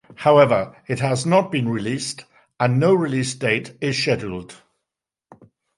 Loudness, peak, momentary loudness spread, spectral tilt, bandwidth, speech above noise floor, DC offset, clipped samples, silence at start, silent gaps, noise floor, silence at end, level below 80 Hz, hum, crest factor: -20 LUFS; -2 dBFS; 12 LU; -5.5 dB/octave; 11.5 kHz; 65 dB; under 0.1%; under 0.1%; 0.2 s; none; -85 dBFS; 1.25 s; -56 dBFS; none; 18 dB